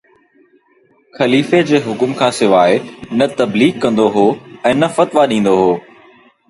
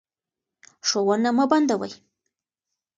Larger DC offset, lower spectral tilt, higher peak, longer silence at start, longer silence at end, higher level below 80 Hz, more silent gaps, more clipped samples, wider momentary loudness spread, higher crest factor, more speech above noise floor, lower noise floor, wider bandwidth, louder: neither; first, -5.5 dB/octave vs -3.5 dB/octave; first, 0 dBFS vs -6 dBFS; first, 1.15 s vs 0.85 s; second, 0.7 s vs 1.05 s; first, -54 dBFS vs -72 dBFS; neither; neither; about the same, 7 LU vs 8 LU; second, 14 dB vs 20 dB; second, 41 dB vs 67 dB; second, -54 dBFS vs -88 dBFS; first, 11.5 kHz vs 9 kHz; first, -14 LUFS vs -22 LUFS